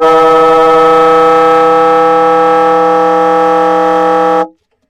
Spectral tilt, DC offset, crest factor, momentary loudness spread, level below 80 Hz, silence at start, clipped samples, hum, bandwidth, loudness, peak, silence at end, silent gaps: -5.5 dB/octave; under 0.1%; 8 dB; 3 LU; -44 dBFS; 0 s; 0.7%; none; 11 kHz; -7 LUFS; 0 dBFS; 0.4 s; none